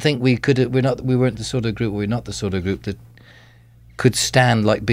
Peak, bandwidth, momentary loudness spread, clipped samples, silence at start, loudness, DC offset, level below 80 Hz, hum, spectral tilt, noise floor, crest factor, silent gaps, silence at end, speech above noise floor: 0 dBFS; 15.5 kHz; 9 LU; under 0.1%; 0 s; -19 LUFS; under 0.1%; -44 dBFS; none; -5.5 dB/octave; -48 dBFS; 18 dB; none; 0 s; 29 dB